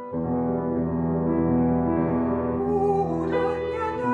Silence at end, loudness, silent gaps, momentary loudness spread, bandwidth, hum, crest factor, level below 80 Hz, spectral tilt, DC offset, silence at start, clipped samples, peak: 0 s; -24 LUFS; none; 4 LU; 4.4 kHz; none; 12 dB; -44 dBFS; -10 dB/octave; under 0.1%; 0 s; under 0.1%; -12 dBFS